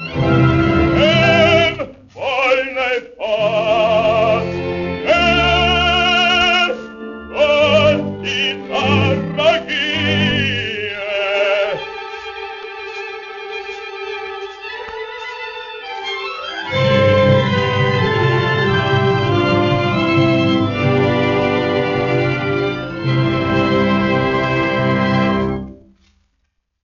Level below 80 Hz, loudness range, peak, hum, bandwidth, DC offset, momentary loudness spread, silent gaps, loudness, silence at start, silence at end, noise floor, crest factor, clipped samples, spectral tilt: -38 dBFS; 10 LU; -2 dBFS; none; 7.2 kHz; under 0.1%; 15 LU; none; -15 LUFS; 0 s; 1.1 s; -68 dBFS; 16 dB; under 0.1%; -3.5 dB/octave